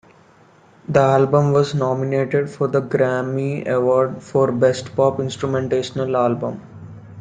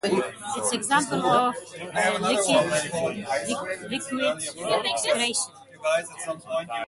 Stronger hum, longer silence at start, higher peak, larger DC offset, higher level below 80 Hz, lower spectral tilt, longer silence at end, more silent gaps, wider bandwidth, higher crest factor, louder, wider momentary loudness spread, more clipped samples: neither; first, 0.9 s vs 0.05 s; first, -2 dBFS vs -6 dBFS; neither; first, -58 dBFS vs -66 dBFS; first, -7 dB/octave vs -2.5 dB/octave; about the same, 0 s vs 0.05 s; neither; second, 9.4 kHz vs 12 kHz; about the same, 16 dB vs 20 dB; first, -19 LUFS vs -25 LUFS; about the same, 9 LU vs 9 LU; neither